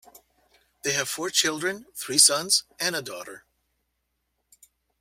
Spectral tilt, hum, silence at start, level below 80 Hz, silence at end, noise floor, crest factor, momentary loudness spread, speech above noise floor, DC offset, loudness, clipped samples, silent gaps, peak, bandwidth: -0.5 dB/octave; none; 0.85 s; -70 dBFS; 1.6 s; -77 dBFS; 26 dB; 19 LU; 52 dB; under 0.1%; -22 LUFS; under 0.1%; none; -2 dBFS; 16 kHz